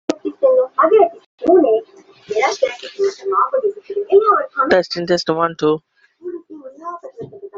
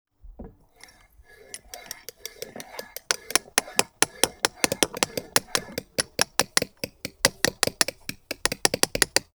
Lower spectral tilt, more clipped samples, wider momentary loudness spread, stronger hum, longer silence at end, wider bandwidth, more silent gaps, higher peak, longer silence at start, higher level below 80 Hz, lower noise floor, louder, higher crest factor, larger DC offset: first, -5 dB/octave vs -1 dB/octave; neither; about the same, 19 LU vs 17 LU; neither; second, 0 s vs 0.15 s; second, 7.6 kHz vs over 20 kHz; first, 1.26-1.38 s vs none; about the same, -2 dBFS vs 0 dBFS; second, 0.1 s vs 0.25 s; second, -62 dBFS vs -54 dBFS; second, -42 dBFS vs -54 dBFS; first, -16 LUFS vs -24 LUFS; second, 16 dB vs 28 dB; neither